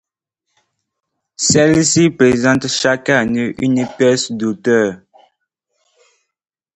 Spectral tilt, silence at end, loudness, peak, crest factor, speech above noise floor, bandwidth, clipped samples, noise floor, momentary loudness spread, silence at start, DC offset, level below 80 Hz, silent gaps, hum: -4 dB/octave; 1.8 s; -14 LUFS; 0 dBFS; 16 dB; 62 dB; 10.5 kHz; under 0.1%; -76 dBFS; 7 LU; 1.4 s; under 0.1%; -50 dBFS; none; none